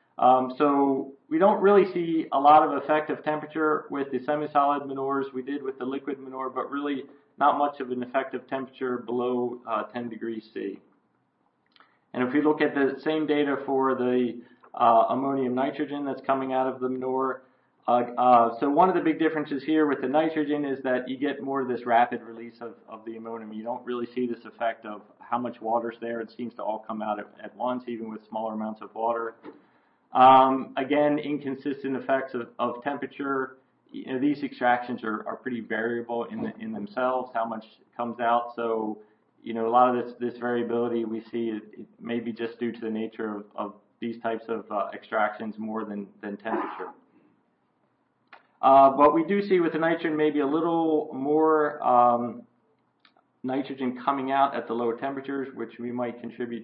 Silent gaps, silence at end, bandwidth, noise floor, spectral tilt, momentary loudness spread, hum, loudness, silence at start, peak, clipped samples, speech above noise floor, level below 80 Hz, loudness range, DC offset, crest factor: none; 0 s; 5.4 kHz; -71 dBFS; -10 dB/octave; 15 LU; none; -26 LUFS; 0.2 s; -8 dBFS; under 0.1%; 45 dB; -76 dBFS; 9 LU; under 0.1%; 18 dB